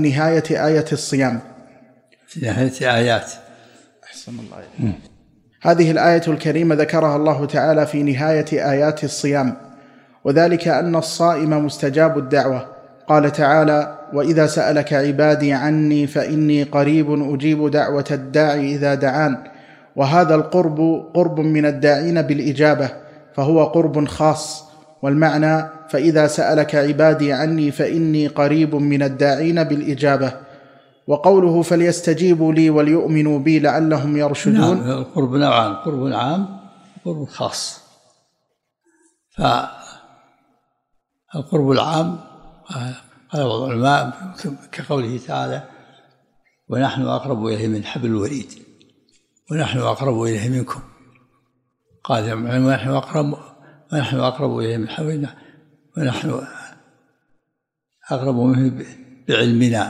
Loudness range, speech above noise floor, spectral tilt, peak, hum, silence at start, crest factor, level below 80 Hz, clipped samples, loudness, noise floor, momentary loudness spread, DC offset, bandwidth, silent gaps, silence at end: 8 LU; 60 dB; -6.5 dB/octave; 0 dBFS; none; 0 s; 18 dB; -56 dBFS; under 0.1%; -18 LUFS; -77 dBFS; 14 LU; under 0.1%; 12.5 kHz; none; 0 s